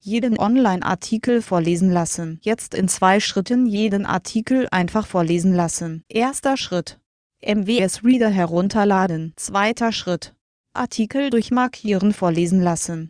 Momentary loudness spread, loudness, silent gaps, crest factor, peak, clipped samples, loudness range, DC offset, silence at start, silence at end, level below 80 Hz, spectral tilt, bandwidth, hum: 8 LU; -20 LUFS; 7.06-7.30 s, 10.41-10.64 s; 16 dB; -2 dBFS; under 0.1%; 2 LU; under 0.1%; 0.05 s; 0 s; -52 dBFS; -5 dB/octave; 10.5 kHz; none